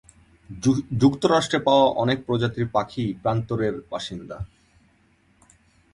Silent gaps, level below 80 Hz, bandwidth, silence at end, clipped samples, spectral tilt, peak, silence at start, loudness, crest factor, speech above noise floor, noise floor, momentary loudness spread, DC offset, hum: none; -50 dBFS; 11.5 kHz; 1.5 s; under 0.1%; -6 dB/octave; -4 dBFS; 0.5 s; -23 LUFS; 20 dB; 39 dB; -61 dBFS; 16 LU; under 0.1%; none